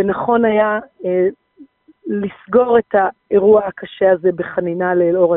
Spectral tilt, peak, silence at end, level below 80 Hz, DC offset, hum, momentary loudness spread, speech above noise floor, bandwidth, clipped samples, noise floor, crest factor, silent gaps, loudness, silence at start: -5.5 dB/octave; -2 dBFS; 0 s; -54 dBFS; under 0.1%; none; 9 LU; 31 dB; 3.9 kHz; under 0.1%; -46 dBFS; 14 dB; none; -16 LUFS; 0 s